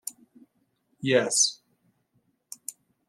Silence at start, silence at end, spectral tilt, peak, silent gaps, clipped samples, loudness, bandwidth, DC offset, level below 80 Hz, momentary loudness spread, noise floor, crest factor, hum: 0.05 s; 0.4 s; -2 dB/octave; -8 dBFS; none; under 0.1%; -23 LUFS; 15.5 kHz; under 0.1%; -76 dBFS; 19 LU; -72 dBFS; 24 dB; none